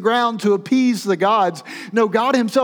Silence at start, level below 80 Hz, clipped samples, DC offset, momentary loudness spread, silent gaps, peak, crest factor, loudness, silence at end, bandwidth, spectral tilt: 0 s; -80 dBFS; under 0.1%; under 0.1%; 5 LU; none; -4 dBFS; 14 dB; -18 LUFS; 0 s; 19 kHz; -5 dB/octave